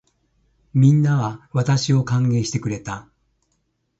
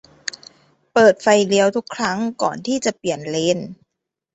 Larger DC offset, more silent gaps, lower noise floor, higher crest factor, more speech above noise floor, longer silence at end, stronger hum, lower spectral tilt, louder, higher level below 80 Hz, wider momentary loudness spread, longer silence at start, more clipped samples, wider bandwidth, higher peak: neither; neither; second, -70 dBFS vs -81 dBFS; about the same, 16 dB vs 18 dB; second, 52 dB vs 63 dB; first, 1 s vs 0.6 s; neither; first, -6.5 dB/octave vs -4 dB/octave; about the same, -20 LUFS vs -18 LUFS; first, -52 dBFS vs -62 dBFS; about the same, 13 LU vs 15 LU; second, 0.75 s vs 0.95 s; neither; about the same, 8 kHz vs 8.2 kHz; about the same, -4 dBFS vs -2 dBFS